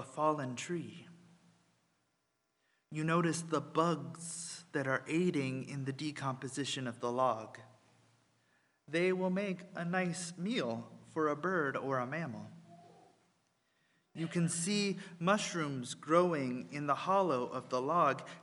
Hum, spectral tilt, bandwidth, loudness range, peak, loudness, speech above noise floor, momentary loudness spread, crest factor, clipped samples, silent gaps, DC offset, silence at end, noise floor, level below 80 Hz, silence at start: none; -5 dB/octave; 11.5 kHz; 6 LU; -14 dBFS; -35 LUFS; 46 dB; 11 LU; 22 dB; under 0.1%; none; under 0.1%; 0 s; -81 dBFS; -82 dBFS; 0 s